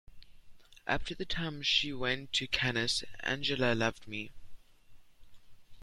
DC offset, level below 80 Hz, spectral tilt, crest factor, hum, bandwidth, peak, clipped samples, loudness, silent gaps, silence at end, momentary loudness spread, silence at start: under 0.1%; -52 dBFS; -3.5 dB/octave; 22 dB; none; 14 kHz; -12 dBFS; under 0.1%; -32 LUFS; none; 0 s; 13 LU; 0.1 s